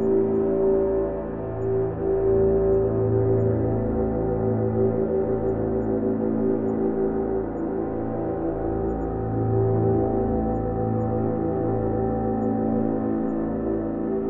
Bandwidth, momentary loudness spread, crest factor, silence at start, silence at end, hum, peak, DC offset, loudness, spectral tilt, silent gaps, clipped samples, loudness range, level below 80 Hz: 2.8 kHz; 6 LU; 12 dB; 0 s; 0 s; none; -10 dBFS; under 0.1%; -24 LUFS; -13 dB/octave; none; under 0.1%; 3 LU; -40 dBFS